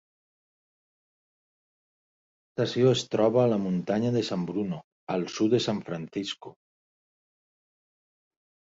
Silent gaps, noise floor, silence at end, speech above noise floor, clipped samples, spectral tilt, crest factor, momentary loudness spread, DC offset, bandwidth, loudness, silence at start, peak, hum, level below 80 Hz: 4.84-5.07 s; under -90 dBFS; 2.15 s; over 64 dB; under 0.1%; -6 dB/octave; 20 dB; 11 LU; under 0.1%; 8 kHz; -27 LUFS; 2.6 s; -10 dBFS; none; -68 dBFS